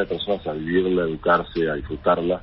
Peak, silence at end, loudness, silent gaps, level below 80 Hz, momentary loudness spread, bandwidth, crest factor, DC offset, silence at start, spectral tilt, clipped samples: -6 dBFS; 0 s; -22 LUFS; none; -44 dBFS; 5 LU; 5.8 kHz; 16 dB; under 0.1%; 0 s; -10.5 dB/octave; under 0.1%